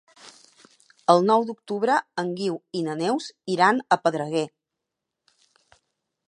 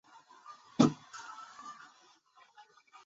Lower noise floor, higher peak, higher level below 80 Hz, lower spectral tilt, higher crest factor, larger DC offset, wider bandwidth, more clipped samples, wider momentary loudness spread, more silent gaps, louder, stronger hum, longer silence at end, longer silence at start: first, -84 dBFS vs -64 dBFS; first, -2 dBFS vs -10 dBFS; about the same, -78 dBFS vs -78 dBFS; about the same, -5 dB/octave vs -6 dB/octave; about the same, 24 dB vs 28 dB; neither; first, 11 kHz vs 7.6 kHz; neither; second, 10 LU vs 26 LU; neither; first, -24 LUFS vs -32 LUFS; neither; first, 1.8 s vs 1.35 s; second, 0.25 s vs 0.5 s